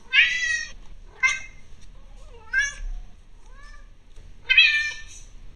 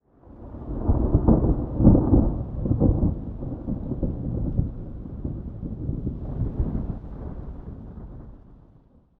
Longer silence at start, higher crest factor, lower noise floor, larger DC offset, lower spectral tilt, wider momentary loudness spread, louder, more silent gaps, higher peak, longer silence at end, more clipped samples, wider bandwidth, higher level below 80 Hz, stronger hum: second, 0.1 s vs 0.3 s; about the same, 24 dB vs 22 dB; second, -44 dBFS vs -55 dBFS; first, 0.4% vs under 0.1%; second, 1.5 dB/octave vs -14.5 dB/octave; first, 24 LU vs 20 LU; first, -20 LUFS vs -25 LUFS; neither; about the same, -2 dBFS vs -2 dBFS; second, 0 s vs 0.65 s; neither; first, 11.5 kHz vs 1.9 kHz; second, -42 dBFS vs -30 dBFS; neither